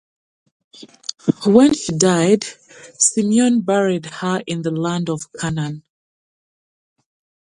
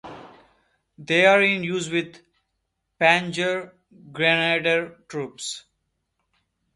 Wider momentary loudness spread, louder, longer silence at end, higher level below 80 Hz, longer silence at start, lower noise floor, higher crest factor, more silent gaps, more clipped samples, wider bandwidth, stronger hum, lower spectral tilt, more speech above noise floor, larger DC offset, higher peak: second, 12 LU vs 17 LU; first, -17 LUFS vs -21 LUFS; first, 1.75 s vs 1.15 s; first, -56 dBFS vs -66 dBFS; first, 0.8 s vs 0.05 s; first, under -90 dBFS vs -77 dBFS; about the same, 18 dB vs 22 dB; neither; neither; about the same, 11.5 kHz vs 11.5 kHz; neither; about the same, -4.5 dB/octave vs -4 dB/octave; first, over 72 dB vs 55 dB; neither; about the same, 0 dBFS vs -2 dBFS